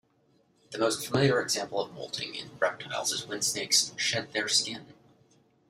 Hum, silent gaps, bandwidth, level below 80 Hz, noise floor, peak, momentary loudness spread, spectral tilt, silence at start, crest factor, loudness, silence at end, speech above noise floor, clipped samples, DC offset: none; none; 15.5 kHz; -70 dBFS; -67 dBFS; -8 dBFS; 11 LU; -2.5 dB/octave; 0.7 s; 22 dB; -28 LUFS; 0.8 s; 38 dB; under 0.1%; under 0.1%